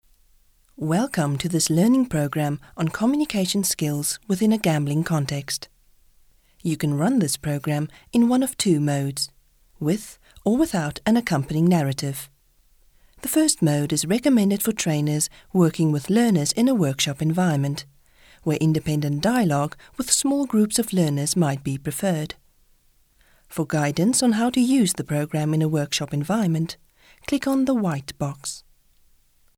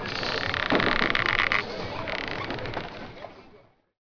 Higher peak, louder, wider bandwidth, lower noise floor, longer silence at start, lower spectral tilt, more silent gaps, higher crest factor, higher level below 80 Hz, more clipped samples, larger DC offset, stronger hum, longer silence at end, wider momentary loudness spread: about the same, -4 dBFS vs -6 dBFS; first, -22 LUFS vs -26 LUFS; first, 18.5 kHz vs 5.4 kHz; about the same, -59 dBFS vs -56 dBFS; first, 0.8 s vs 0 s; about the same, -5 dB/octave vs -4.5 dB/octave; neither; second, 18 dB vs 24 dB; second, -54 dBFS vs -44 dBFS; neither; neither; neither; first, 1 s vs 0.45 s; second, 10 LU vs 18 LU